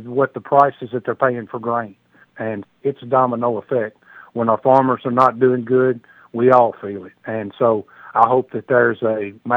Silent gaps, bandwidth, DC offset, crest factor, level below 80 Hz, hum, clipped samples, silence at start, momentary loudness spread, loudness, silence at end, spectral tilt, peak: none; 5.8 kHz; under 0.1%; 18 dB; -68 dBFS; none; under 0.1%; 0 s; 14 LU; -18 LUFS; 0 s; -9 dB/octave; 0 dBFS